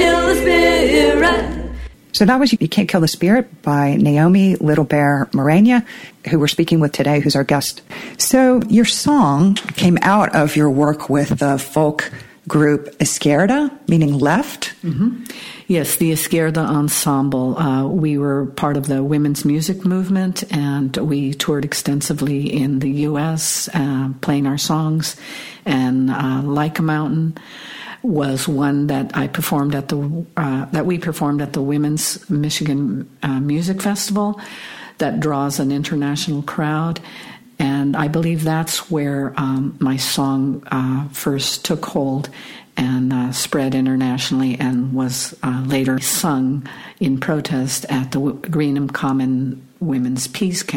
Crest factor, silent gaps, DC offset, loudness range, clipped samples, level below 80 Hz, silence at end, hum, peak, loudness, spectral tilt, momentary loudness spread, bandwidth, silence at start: 16 dB; none; under 0.1%; 6 LU; under 0.1%; -42 dBFS; 0 s; none; -2 dBFS; -17 LUFS; -5 dB/octave; 10 LU; 17 kHz; 0 s